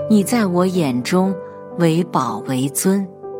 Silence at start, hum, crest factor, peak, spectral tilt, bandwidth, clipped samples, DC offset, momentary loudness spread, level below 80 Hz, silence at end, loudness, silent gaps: 0 s; none; 16 dB; -2 dBFS; -6 dB/octave; 16.5 kHz; under 0.1%; under 0.1%; 6 LU; -68 dBFS; 0 s; -18 LUFS; none